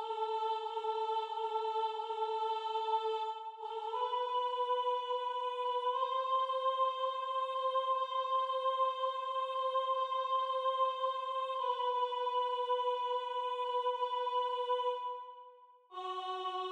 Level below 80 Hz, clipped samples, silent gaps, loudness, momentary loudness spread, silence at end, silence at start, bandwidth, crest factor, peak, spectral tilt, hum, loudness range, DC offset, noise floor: under -90 dBFS; under 0.1%; none; -35 LUFS; 5 LU; 0 s; 0 s; 9.6 kHz; 14 dB; -22 dBFS; 0 dB/octave; none; 2 LU; under 0.1%; -59 dBFS